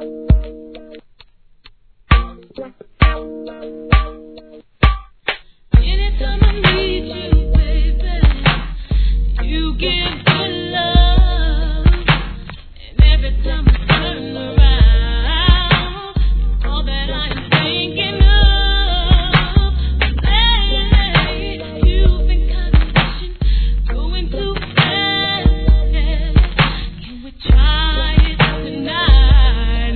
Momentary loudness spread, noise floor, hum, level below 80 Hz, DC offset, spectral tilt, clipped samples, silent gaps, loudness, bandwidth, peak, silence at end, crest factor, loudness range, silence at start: 10 LU; -47 dBFS; none; -16 dBFS; 0.2%; -8.5 dB/octave; under 0.1%; none; -16 LUFS; 4.5 kHz; 0 dBFS; 0 s; 14 dB; 5 LU; 0 s